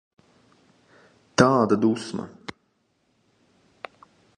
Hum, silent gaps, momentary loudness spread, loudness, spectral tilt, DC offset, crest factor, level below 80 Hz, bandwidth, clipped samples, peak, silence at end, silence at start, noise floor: none; none; 24 LU; -22 LUFS; -5.5 dB/octave; under 0.1%; 24 dB; -58 dBFS; 11 kHz; under 0.1%; -2 dBFS; 2.1 s; 1.4 s; -69 dBFS